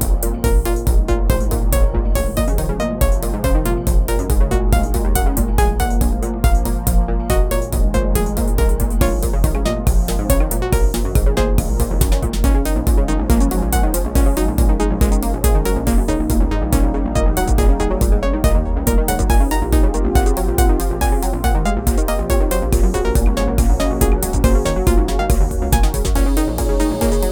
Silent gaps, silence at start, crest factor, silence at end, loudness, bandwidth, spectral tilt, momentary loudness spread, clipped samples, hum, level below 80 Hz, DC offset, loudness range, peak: none; 0 s; 14 dB; 0 s; -18 LUFS; over 20 kHz; -6 dB/octave; 2 LU; under 0.1%; none; -16 dBFS; under 0.1%; 1 LU; 0 dBFS